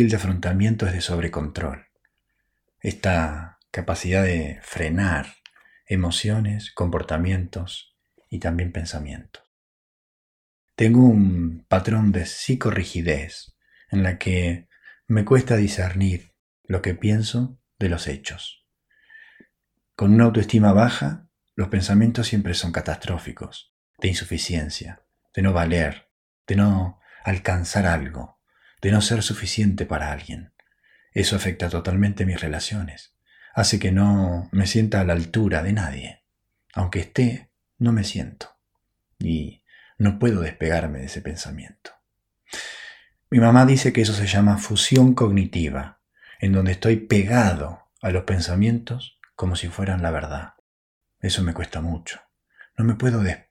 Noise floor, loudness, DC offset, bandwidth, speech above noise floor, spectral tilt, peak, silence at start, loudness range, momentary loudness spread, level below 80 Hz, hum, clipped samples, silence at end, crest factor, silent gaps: -76 dBFS; -22 LUFS; under 0.1%; 13 kHz; 56 dB; -6 dB/octave; -2 dBFS; 0 s; 8 LU; 17 LU; -40 dBFS; none; under 0.1%; 0.15 s; 22 dB; 9.47-10.68 s, 16.39-16.64 s, 23.69-23.94 s, 26.11-26.45 s, 50.60-51.01 s